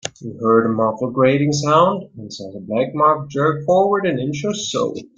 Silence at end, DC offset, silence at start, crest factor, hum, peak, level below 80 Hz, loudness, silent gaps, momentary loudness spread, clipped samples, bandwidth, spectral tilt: 0.15 s; under 0.1%; 0.05 s; 16 dB; none; -2 dBFS; -58 dBFS; -18 LUFS; none; 13 LU; under 0.1%; 9.2 kHz; -5.5 dB/octave